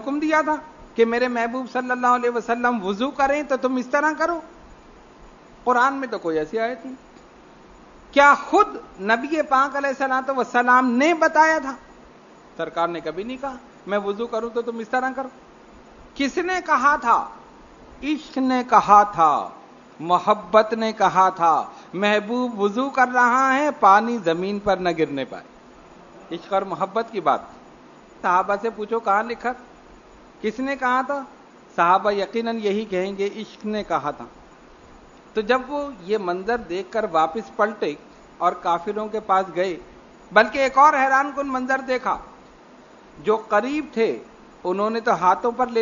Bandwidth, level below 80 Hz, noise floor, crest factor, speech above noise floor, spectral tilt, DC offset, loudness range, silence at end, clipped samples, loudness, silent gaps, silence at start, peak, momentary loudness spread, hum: 7.4 kHz; -56 dBFS; -47 dBFS; 22 dB; 27 dB; -4.5 dB/octave; under 0.1%; 7 LU; 0 s; under 0.1%; -21 LUFS; none; 0 s; 0 dBFS; 13 LU; none